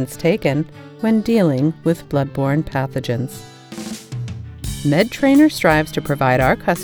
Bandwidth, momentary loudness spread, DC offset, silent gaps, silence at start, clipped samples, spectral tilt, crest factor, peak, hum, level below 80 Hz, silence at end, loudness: over 20 kHz; 16 LU; under 0.1%; none; 0 s; under 0.1%; -6.5 dB/octave; 18 dB; 0 dBFS; none; -40 dBFS; 0 s; -17 LUFS